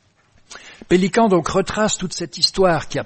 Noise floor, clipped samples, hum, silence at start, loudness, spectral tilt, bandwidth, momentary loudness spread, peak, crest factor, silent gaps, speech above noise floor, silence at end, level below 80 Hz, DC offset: -55 dBFS; under 0.1%; none; 0.5 s; -18 LUFS; -4 dB/octave; 8.8 kHz; 10 LU; -2 dBFS; 18 dB; none; 38 dB; 0 s; -42 dBFS; under 0.1%